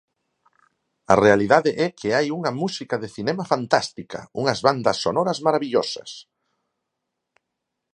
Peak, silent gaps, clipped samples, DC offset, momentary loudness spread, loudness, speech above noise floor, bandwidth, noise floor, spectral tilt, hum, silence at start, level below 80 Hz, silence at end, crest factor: 0 dBFS; none; under 0.1%; under 0.1%; 14 LU; -21 LUFS; 60 dB; 10.5 kHz; -81 dBFS; -5 dB/octave; none; 1.1 s; -58 dBFS; 1.7 s; 22 dB